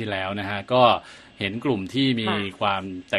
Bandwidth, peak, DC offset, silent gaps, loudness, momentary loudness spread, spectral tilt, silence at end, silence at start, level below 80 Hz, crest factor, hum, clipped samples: 12 kHz; -4 dBFS; under 0.1%; none; -23 LUFS; 11 LU; -6 dB/octave; 0 s; 0 s; -60 dBFS; 20 dB; none; under 0.1%